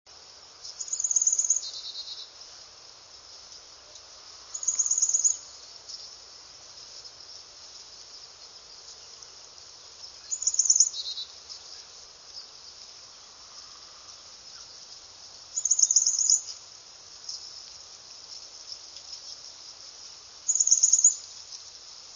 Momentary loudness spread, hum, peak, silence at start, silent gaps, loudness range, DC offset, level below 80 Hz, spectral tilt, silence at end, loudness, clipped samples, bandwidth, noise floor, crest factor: 25 LU; none; -6 dBFS; 0.1 s; none; 19 LU; under 0.1%; -72 dBFS; 3.5 dB/octave; 0 s; -23 LUFS; under 0.1%; 7.6 kHz; -50 dBFS; 26 dB